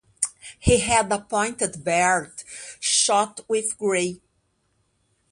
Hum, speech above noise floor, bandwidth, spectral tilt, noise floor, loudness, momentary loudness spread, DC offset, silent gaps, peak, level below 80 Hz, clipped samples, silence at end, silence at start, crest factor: none; 47 dB; 11.5 kHz; -2.5 dB/octave; -69 dBFS; -22 LUFS; 9 LU; under 0.1%; none; -4 dBFS; -42 dBFS; under 0.1%; 1.15 s; 0.2 s; 20 dB